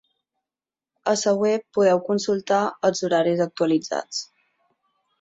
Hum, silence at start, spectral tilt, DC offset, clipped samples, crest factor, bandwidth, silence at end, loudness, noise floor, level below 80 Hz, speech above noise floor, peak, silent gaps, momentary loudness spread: none; 1.05 s; -4.5 dB/octave; under 0.1%; under 0.1%; 16 dB; 8.2 kHz; 0.95 s; -22 LUFS; under -90 dBFS; -68 dBFS; over 69 dB; -6 dBFS; none; 9 LU